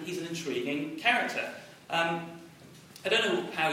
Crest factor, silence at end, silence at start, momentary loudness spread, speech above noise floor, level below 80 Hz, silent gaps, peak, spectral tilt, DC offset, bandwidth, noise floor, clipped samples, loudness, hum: 22 dB; 0 s; 0 s; 18 LU; 21 dB; -74 dBFS; none; -10 dBFS; -3.5 dB/octave; under 0.1%; 16 kHz; -52 dBFS; under 0.1%; -30 LUFS; none